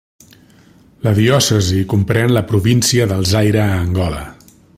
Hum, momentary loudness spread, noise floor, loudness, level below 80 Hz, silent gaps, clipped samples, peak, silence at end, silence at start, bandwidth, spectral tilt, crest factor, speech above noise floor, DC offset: none; 8 LU; -47 dBFS; -14 LUFS; -40 dBFS; none; under 0.1%; 0 dBFS; 0.45 s; 1.05 s; 16 kHz; -5 dB/octave; 14 dB; 33 dB; under 0.1%